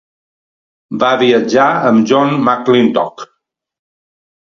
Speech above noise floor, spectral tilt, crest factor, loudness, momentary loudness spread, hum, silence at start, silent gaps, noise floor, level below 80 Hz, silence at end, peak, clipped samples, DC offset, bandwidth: 57 dB; -6 dB/octave; 14 dB; -12 LUFS; 7 LU; none; 0.9 s; none; -68 dBFS; -60 dBFS; 1.3 s; 0 dBFS; under 0.1%; under 0.1%; 7.4 kHz